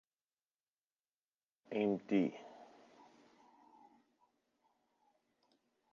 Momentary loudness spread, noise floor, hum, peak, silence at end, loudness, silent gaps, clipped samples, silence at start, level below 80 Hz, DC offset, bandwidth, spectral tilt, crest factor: 24 LU; under -90 dBFS; none; -22 dBFS; 3.3 s; -37 LUFS; none; under 0.1%; 1.7 s; under -90 dBFS; under 0.1%; 7.2 kHz; -6.5 dB/octave; 22 dB